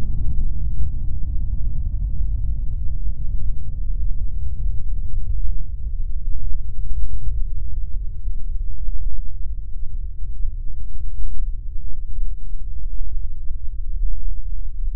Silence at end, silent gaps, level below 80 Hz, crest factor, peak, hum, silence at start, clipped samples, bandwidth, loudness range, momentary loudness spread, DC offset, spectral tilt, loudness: 0 s; none; -22 dBFS; 10 dB; -2 dBFS; none; 0 s; under 0.1%; 0.5 kHz; 5 LU; 7 LU; under 0.1%; -13 dB/octave; -30 LUFS